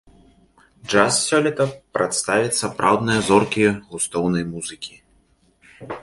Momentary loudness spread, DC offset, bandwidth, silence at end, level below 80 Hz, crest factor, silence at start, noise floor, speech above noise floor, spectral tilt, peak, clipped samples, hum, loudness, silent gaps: 14 LU; under 0.1%; 11.5 kHz; 0 s; -52 dBFS; 22 dB; 0.85 s; -60 dBFS; 40 dB; -4 dB/octave; 0 dBFS; under 0.1%; none; -20 LUFS; none